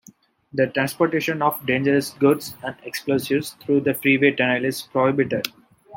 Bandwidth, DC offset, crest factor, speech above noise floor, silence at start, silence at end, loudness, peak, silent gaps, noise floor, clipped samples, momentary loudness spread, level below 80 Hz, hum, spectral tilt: 17 kHz; under 0.1%; 20 dB; 31 dB; 0.55 s; 0 s; -21 LUFS; -2 dBFS; none; -52 dBFS; under 0.1%; 11 LU; -64 dBFS; none; -5.5 dB/octave